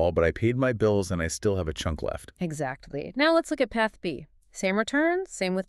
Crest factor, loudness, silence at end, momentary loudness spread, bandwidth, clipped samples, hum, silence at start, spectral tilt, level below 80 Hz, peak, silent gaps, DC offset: 16 dB; -27 LUFS; 0.05 s; 11 LU; 13 kHz; under 0.1%; none; 0 s; -5.5 dB/octave; -44 dBFS; -10 dBFS; none; under 0.1%